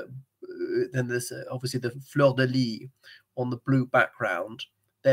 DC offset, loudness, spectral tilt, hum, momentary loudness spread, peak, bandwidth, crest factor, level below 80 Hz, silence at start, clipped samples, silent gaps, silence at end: under 0.1%; -27 LUFS; -6 dB/octave; none; 19 LU; -8 dBFS; 16 kHz; 20 dB; -74 dBFS; 0 s; under 0.1%; none; 0 s